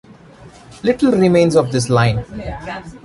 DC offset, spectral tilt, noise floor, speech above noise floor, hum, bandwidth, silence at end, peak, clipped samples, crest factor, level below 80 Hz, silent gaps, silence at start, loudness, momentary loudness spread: under 0.1%; -6.5 dB/octave; -41 dBFS; 26 dB; none; 11.5 kHz; 0.05 s; -2 dBFS; under 0.1%; 14 dB; -40 dBFS; none; 0.4 s; -15 LUFS; 16 LU